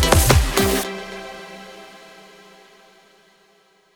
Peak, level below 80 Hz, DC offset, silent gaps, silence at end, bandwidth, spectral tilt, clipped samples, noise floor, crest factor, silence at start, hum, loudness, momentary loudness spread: 0 dBFS; -28 dBFS; under 0.1%; none; 2.1 s; over 20 kHz; -4 dB/octave; under 0.1%; -57 dBFS; 22 dB; 0 s; none; -18 LUFS; 26 LU